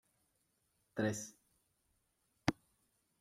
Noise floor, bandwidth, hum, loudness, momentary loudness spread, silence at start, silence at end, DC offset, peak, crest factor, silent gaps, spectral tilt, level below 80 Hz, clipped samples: -81 dBFS; 16 kHz; none; -41 LUFS; 13 LU; 0.95 s; 0.7 s; under 0.1%; -18 dBFS; 28 dB; none; -5 dB/octave; -70 dBFS; under 0.1%